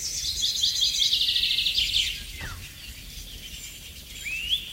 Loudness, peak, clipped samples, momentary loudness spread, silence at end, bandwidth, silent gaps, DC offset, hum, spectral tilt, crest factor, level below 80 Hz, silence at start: -23 LUFS; -10 dBFS; under 0.1%; 19 LU; 0 s; 16 kHz; none; under 0.1%; none; 1 dB/octave; 18 dB; -46 dBFS; 0 s